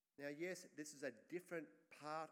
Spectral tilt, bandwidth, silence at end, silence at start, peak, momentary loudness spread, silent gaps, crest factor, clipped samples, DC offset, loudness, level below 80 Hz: -4 dB/octave; 16.5 kHz; 0 s; 0.2 s; -36 dBFS; 6 LU; none; 16 dB; under 0.1%; under 0.1%; -52 LUFS; under -90 dBFS